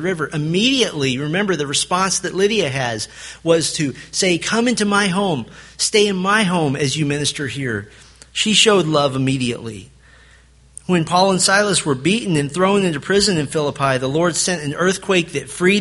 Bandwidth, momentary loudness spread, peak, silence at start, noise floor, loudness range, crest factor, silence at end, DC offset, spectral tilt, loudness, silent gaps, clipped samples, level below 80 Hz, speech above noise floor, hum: 11.5 kHz; 9 LU; 0 dBFS; 0 s; -49 dBFS; 2 LU; 18 dB; 0 s; under 0.1%; -3.5 dB/octave; -17 LUFS; none; under 0.1%; -50 dBFS; 31 dB; none